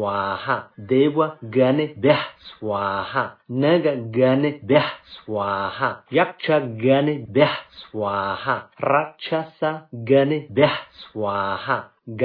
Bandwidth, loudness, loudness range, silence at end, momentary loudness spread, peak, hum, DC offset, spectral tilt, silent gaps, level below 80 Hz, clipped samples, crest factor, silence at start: 5.2 kHz; -21 LUFS; 1 LU; 0 s; 9 LU; -2 dBFS; none; under 0.1%; -9.5 dB/octave; none; -62 dBFS; under 0.1%; 18 dB; 0 s